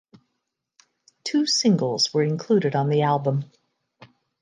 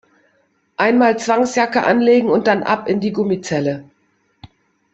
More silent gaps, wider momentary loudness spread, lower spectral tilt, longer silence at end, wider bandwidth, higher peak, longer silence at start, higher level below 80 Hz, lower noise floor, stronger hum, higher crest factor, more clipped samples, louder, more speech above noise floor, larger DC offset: neither; about the same, 9 LU vs 7 LU; about the same, -5 dB/octave vs -5.5 dB/octave; first, 0.95 s vs 0.45 s; first, 9.8 kHz vs 8.2 kHz; second, -8 dBFS vs -2 dBFS; first, 1.25 s vs 0.8 s; second, -74 dBFS vs -60 dBFS; first, -79 dBFS vs -62 dBFS; neither; about the same, 16 dB vs 14 dB; neither; second, -22 LUFS vs -16 LUFS; first, 58 dB vs 47 dB; neither